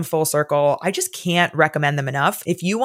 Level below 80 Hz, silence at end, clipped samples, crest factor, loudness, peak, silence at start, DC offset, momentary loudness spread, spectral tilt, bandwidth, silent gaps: -70 dBFS; 0 s; under 0.1%; 18 dB; -19 LUFS; -2 dBFS; 0 s; under 0.1%; 5 LU; -4.5 dB/octave; 16.5 kHz; none